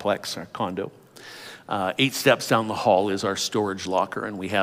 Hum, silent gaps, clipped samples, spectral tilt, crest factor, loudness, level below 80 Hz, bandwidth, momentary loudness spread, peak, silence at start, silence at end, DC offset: none; none; under 0.1%; -4 dB/octave; 20 dB; -24 LUFS; -70 dBFS; 16 kHz; 16 LU; -4 dBFS; 0 s; 0 s; under 0.1%